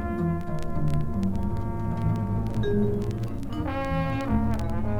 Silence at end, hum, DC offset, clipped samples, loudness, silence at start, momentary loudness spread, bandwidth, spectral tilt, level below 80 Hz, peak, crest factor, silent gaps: 0 s; none; under 0.1%; under 0.1%; -28 LUFS; 0 s; 5 LU; 11 kHz; -8.5 dB/octave; -34 dBFS; -12 dBFS; 14 dB; none